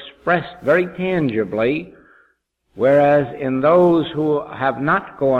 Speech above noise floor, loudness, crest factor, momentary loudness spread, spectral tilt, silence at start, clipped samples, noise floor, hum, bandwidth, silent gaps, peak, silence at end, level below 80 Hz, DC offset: 47 dB; -18 LUFS; 14 dB; 7 LU; -8.5 dB/octave; 0 s; under 0.1%; -64 dBFS; none; 5.8 kHz; none; -4 dBFS; 0 s; -54 dBFS; under 0.1%